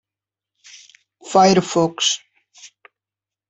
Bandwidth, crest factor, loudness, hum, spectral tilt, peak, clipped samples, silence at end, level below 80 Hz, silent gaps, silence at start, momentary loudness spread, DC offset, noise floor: 8.4 kHz; 20 dB; -17 LUFS; none; -4 dB/octave; -2 dBFS; under 0.1%; 0.85 s; -62 dBFS; none; 1.25 s; 6 LU; under 0.1%; -89 dBFS